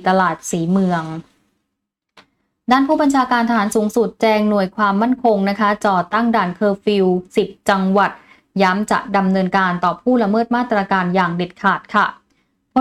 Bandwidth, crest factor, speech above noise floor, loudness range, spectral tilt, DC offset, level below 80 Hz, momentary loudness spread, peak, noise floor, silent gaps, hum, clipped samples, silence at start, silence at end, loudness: 13.5 kHz; 14 dB; 61 dB; 3 LU; -6 dB/octave; under 0.1%; -54 dBFS; 5 LU; -4 dBFS; -77 dBFS; none; none; under 0.1%; 0 s; 0 s; -17 LUFS